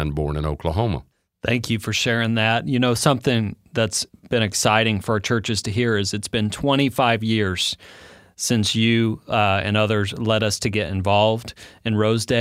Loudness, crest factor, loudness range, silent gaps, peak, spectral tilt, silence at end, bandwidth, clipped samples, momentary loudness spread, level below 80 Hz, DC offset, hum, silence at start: -21 LUFS; 20 dB; 1 LU; none; -2 dBFS; -4.5 dB/octave; 0 s; 16 kHz; under 0.1%; 7 LU; -42 dBFS; under 0.1%; none; 0 s